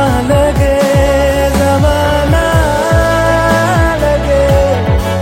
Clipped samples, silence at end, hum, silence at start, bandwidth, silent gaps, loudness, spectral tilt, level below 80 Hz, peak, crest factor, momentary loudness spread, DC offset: under 0.1%; 0 s; none; 0 s; 16.5 kHz; none; -11 LUFS; -6 dB/octave; -18 dBFS; 0 dBFS; 10 dB; 1 LU; under 0.1%